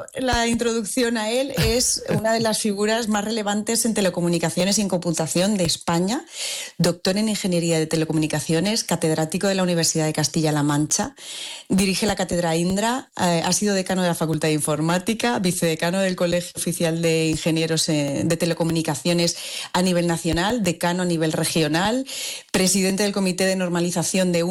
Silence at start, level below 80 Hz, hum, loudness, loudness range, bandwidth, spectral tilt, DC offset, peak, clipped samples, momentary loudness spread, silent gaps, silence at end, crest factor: 0 s; -46 dBFS; none; -21 LUFS; 1 LU; 17 kHz; -4 dB/octave; under 0.1%; -10 dBFS; under 0.1%; 3 LU; none; 0 s; 12 dB